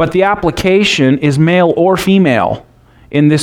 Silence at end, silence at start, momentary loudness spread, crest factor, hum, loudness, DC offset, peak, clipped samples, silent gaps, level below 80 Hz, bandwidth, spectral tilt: 0 s; 0 s; 5 LU; 10 dB; none; -11 LUFS; under 0.1%; 0 dBFS; under 0.1%; none; -38 dBFS; 16.5 kHz; -6 dB/octave